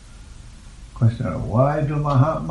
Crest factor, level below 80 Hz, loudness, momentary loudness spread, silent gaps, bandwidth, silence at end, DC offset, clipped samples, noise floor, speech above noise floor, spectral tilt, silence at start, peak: 16 dB; -38 dBFS; -20 LUFS; 4 LU; none; 10 kHz; 0 s; under 0.1%; under 0.1%; -40 dBFS; 21 dB; -9 dB/octave; 0 s; -4 dBFS